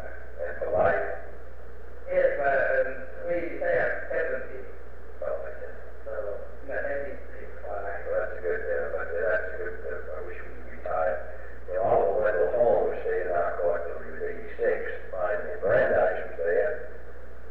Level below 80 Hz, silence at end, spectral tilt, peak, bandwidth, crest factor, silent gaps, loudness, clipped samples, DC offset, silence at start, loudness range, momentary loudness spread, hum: -46 dBFS; 0 s; -8 dB/octave; -10 dBFS; 5 kHz; 18 dB; none; -28 LUFS; under 0.1%; 3%; 0 s; 8 LU; 19 LU; none